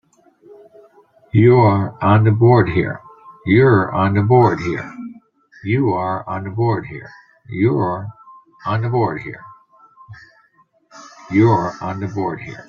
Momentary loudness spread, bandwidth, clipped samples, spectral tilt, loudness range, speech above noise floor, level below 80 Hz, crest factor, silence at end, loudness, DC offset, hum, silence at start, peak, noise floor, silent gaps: 19 LU; 6.8 kHz; under 0.1%; -9 dB/octave; 8 LU; 42 dB; -50 dBFS; 16 dB; 0.05 s; -16 LUFS; under 0.1%; none; 1.35 s; -2 dBFS; -57 dBFS; none